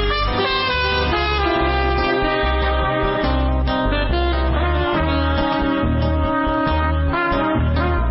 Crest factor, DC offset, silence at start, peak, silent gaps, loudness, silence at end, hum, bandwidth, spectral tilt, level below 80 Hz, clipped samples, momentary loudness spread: 12 dB; under 0.1%; 0 s; -6 dBFS; none; -19 LUFS; 0 s; none; 5.8 kHz; -9.5 dB/octave; -24 dBFS; under 0.1%; 1 LU